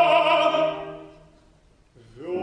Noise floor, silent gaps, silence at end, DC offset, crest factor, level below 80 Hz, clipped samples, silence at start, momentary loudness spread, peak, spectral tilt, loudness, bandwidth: -57 dBFS; none; 0 s; under 0.1%; 16 dB; -60 dBFS; under 0.1%; 0 s; 22 LU; -8 dBFS; -4.5 dB/octave; -21 LUFS; 10 kHz